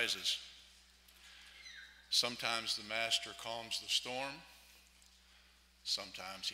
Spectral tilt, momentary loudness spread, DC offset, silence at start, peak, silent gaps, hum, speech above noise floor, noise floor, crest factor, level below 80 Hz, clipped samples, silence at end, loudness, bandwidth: 0 dB/octave; 21 LU; under 0.1%; 0 s; -18 dBFS; none; none; 27 dB; -66 dBFS; 24 dB; -72 dBFS; under 0.1%; 0 s; -37 LUFS; 16 kHz